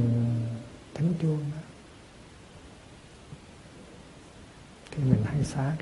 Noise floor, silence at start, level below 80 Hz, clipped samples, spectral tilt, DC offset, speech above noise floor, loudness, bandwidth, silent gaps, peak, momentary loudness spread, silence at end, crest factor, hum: -50 dBFS; 0 s; -54 dBFS; under 0.1%; -8 dB/octave; under 0.1%; 23 dB; -29 LUFS; 11.5 kHz; none; -8 dBFS; 24 LU; 0 s; 22 dB; none